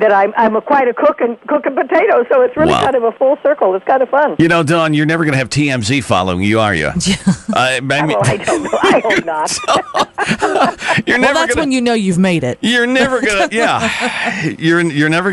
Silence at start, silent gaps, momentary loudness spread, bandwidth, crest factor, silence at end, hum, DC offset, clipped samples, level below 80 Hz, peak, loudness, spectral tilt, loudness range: 0 s; none; 4 LU; 11.5 kHz; 12 dB; 0 s; none; under 0.1%; under 0.1%; -42 dBFS; 0 dBFS; -13 LUFS; -5 dB/octave; 1 LU